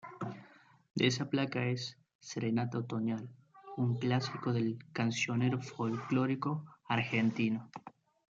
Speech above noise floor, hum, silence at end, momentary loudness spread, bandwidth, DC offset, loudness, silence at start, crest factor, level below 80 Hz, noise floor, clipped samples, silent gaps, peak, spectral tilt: 27 dB; none; 0.4 s; 12 LU; 7.8 kHz; under 0.1%; -35 LUFS; 0.05 s; 20 dB; -76 dBFS; -61 dBFS; under 0.1%; 2.15-2.19 s; -16 dBFS; -6 dB/octave